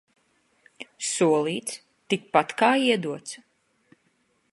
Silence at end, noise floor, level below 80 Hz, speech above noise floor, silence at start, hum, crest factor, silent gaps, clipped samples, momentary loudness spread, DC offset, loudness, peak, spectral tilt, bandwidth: 1.15 s; -69 dBFS; -78 dBFS; 45 dB; 0.8 s; none; 24 dB; none; under 0.1%; 20 LU; under 0.1%; -24 LUFS; -4 dBFS; -3.5 dB/octave; 11.5 kHz